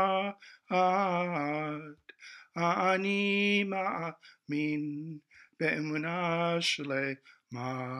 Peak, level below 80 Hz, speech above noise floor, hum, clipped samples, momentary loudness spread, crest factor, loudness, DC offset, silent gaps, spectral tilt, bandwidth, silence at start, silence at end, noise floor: -14 dBFS; -80 dBFS; 21 dB; none; under 0.1%; 18 LU; 18 dB; -31 LUFS; under 0.1%; none; -5 dB/octave; 11.5 kHz; 0 s; 0 s; -53 dBFS